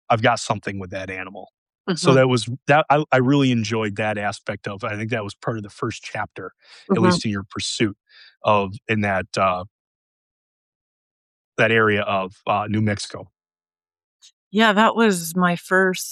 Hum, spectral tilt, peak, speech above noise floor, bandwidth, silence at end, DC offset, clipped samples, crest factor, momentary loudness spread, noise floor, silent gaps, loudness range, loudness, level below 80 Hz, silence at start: none; -5 dB/octave; -4 dBFS; over 69 dB; 13 kHz; 0 s; under 0.1%; under 0.1%; 18 dB; 13 LU; under -90 dBFS; 1.58-1.66 s, 1.80-1.84 s, 9.71-11.52 s, 14.04-14.19 s, 14.33-14.51 s; 5 LU; -21 LUFS; -60 dBFS; 0.1 s